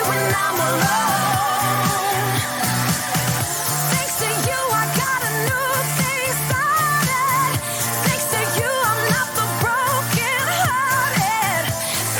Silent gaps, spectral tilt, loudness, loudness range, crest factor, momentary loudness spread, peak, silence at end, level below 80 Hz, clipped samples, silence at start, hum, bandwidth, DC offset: none; -3 dB/octave; -19 LUFS; 1 LU; 14 dB; 2 LU; -6 dBFS; 0 s; -52 dBFS; under 0.1%; 0 s; none; 17.5 kHz; under 0.1%